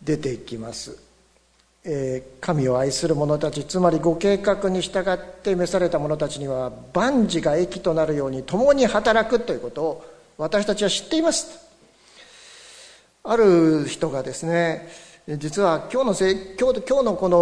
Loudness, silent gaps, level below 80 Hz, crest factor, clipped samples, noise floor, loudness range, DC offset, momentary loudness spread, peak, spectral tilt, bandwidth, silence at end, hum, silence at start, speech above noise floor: -22 LUFS; none; -48 dBFS; 18 dB; under 0.1%; -60 dBFS; 4 LU; under 0.1%; 14 LU; -4 dBFS; -5 dB/octave; 11 kHz; 0 s; none; 0 s; 39 dB